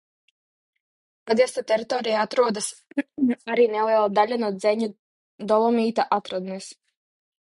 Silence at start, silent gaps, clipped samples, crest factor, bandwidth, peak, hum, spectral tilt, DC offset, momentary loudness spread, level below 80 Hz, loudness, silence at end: 1.25 s; 4.99-5.38 s; under 0.1%; 18 dB; 11.5 kHz; -6 dBFS; none; -4.5 dB/octave; under 0.1%; 11 LU; -74 dBFS; -23 LUFS; 0.75 s